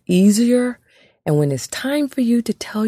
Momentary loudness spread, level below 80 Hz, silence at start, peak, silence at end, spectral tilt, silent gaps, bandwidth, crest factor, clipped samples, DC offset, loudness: 11 LU; -60 dBFS; 0.1 s; -4 dBFS; 0 s; -6 dB/octave; none; 15.5 kHz; 14 dB; under 0.1%; under 0.1%; -18 LUFS